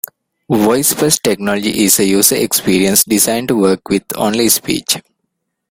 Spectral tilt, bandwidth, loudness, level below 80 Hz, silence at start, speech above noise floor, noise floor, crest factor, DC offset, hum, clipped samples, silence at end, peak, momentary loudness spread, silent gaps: -3 dB/octave; over 20 kHz; -12 LUFS; -48 dBFS; 0.5 s; 59 dB; -72 dBFS; 14 dB; under 0.1%; none; under 0.1%; 0.7 s; 0 dBFS; 7 LU; none